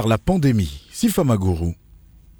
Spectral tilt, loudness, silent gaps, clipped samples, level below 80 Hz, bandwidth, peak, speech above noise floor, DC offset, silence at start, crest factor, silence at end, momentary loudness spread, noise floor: -6.5 dB/octave; -20 LUFS; none; under 0.1%; -36 dBFS; over 20 kHz; -4 dBFS; 29 dB; under 0.1%; 0 s; 16 dB; 0.65 s; 10 LU; -47 dBFS